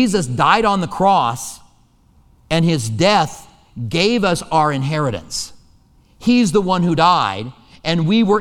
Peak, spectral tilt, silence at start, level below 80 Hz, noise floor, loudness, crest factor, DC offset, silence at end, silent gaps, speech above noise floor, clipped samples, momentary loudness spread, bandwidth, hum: 0 dBFS; -5 dB/octave; 0 s; -44 dBFS; -53 dBFS; -16 LUFS; 16 dB; under 0.1%; 0 s; none; 37 dB; under 0.1%; 12 LU; 14.5 kHz; none